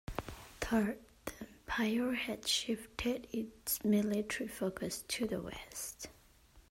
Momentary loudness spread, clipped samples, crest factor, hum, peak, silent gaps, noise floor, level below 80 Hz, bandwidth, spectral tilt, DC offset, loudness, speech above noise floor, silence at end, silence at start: 14 LU; under 0.1%; 18 dB; none; -20 dBFS; none; -63 dBFS; -58 dBFS; 16 kHz; -3.5 dB/octave; under 0.1%; -37 LUFS; 27 dB; 0.1 s; 0.1 s